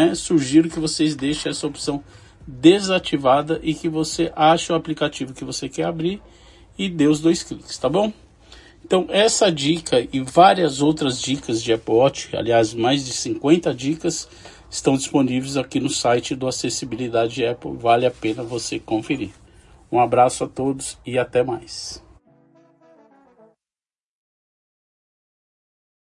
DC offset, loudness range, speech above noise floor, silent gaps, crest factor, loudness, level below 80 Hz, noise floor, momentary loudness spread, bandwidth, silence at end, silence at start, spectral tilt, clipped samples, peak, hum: under 0.1%; 5 LU; over 70 dB; none; 20 dB; -20 LUFS; -50 dBFS; under -90 dBFS; 11 LU; 11.5 kHz; 4.05 s; 0 s; -4.5 dB/octave; under 0.1%; 0 dBFS; none